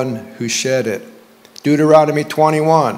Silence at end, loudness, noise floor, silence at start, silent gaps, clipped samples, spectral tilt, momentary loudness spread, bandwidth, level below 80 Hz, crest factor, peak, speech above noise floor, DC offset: 0 s; -15 LUFS; -42 dBFS; 0 s; none; 0.1%; -5 dB/octave; 13 LU; 16 kHz; -60 dBFS; 14 dB; 0 dBFS; 27 dB; under 0.1%